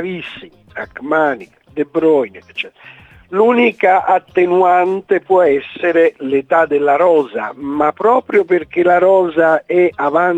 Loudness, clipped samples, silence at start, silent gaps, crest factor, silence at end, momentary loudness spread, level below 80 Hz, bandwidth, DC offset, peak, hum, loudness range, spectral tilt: -14 LUFS; under 0.1%; 0 s; none; 14 dB; 0 s; 14 LU; -56 dBFS; 8 kHz; under 0.1%; 0 dBFS; none; 4 LU; -7 dB/octave